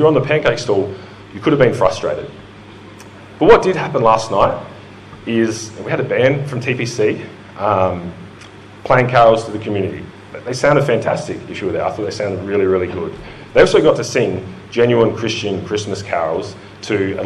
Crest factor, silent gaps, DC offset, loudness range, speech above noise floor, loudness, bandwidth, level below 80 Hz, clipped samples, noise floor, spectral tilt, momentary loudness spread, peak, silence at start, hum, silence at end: 16 dB; none; under 0.1%; 3 LU; 22 dB; -16 LUFS; 11.5 kHz; -44 dBFS; under 0.1%; -37 dBFS; -5.5 dB/octave; 20 LU; 0 dBFS; 0 s; none; 0 s